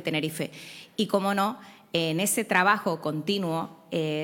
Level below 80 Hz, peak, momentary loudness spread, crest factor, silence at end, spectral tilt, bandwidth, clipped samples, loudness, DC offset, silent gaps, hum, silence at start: -72 dBFS; -6 dBFS; 13 LU; 20 dB; 0 s; -4 dB/octave; 19 kHz; under 0.1%; -27 LUFS; under 0.1%; none; none; 0 s